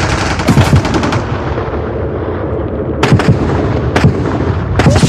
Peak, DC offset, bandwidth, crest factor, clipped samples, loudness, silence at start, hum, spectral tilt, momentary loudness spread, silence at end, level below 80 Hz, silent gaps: 0 dBFS; under 0.1%; 14 kHz; 12 dB; under 0.1%; -13 LUFS; 0 s; none; -6.5 dB/octave; 8 LU; 0 s; -22 dBFS; none